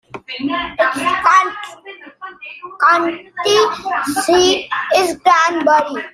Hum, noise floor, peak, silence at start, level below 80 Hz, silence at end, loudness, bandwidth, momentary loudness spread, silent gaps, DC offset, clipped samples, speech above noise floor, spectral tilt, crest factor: none; -37 dBFS; 0 dBFS; 0.15 s; -52 dBFS; 0.05 s; -15 LUFS; 15.5 kHz; 19 LU; none; under 0.1%; under 0.1%; 22 dB; -2 dB/octave; 16 dB